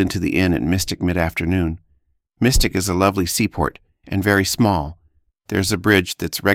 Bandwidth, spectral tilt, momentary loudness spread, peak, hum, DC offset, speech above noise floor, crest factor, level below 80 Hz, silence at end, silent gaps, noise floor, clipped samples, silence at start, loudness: 17 kHz; -4.5 dB/octave; 8 LU; -2 dBFS; none; under 0.1%; 44 dB; 18 dB; -32 dBFS; 0 s; none; -63 dBFS; under 0.1%; 0 s; -19 LUFS